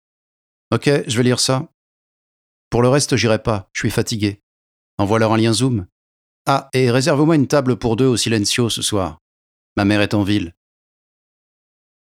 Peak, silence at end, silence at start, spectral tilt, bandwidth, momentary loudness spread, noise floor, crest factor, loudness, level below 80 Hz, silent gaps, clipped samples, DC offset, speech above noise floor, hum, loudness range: -2 dBFS; 1.55 s; 0.7 s; -5 dB/octave; 16 kHz; 8 LU; under -90 dBFS; 18 dB; -17 LUFS; -46 dBFS; 1.74-2.71 s, 4.43-4.98 s, 5.92-6.45 s, 9.21-9.76 s; under 0.1%; under 0.1%; over 73 dB; none; 3 LU